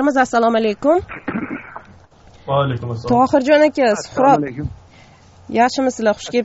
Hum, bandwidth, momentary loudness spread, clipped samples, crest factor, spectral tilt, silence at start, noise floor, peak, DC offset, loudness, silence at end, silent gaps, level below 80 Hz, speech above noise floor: none; 8 kHz; 15 LU; under 0.1%; 16 dB; -4.5 dB/octave; 0 s; -45 dBFS; 0 dBFS; under 0.1%; -17 LUFS; 0 s; none; -46 dBFS; 30 dB